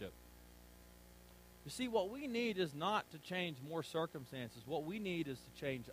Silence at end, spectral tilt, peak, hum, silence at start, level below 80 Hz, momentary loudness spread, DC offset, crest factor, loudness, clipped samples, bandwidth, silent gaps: 0 s; -5 dB/octave; -24 dBFS; 60 Hz at -65 dBFS; 0 s; -68 dBFS; 22 LU; under 0.1%; 20 dB; -42 LUFS; under 0.1%; 15.5 kHz; none